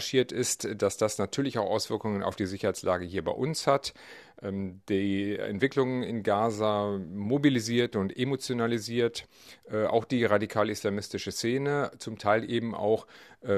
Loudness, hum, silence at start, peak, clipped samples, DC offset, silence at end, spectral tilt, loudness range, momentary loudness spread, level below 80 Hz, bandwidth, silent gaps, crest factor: -29 LUFS; none; 0 s; -8 dBFS; under 0.1%; under 0.1%; 0 s; -5 dB/octave; 2 LU; 8 LU; -66 dBFS; 14 kHz; none; 20 dB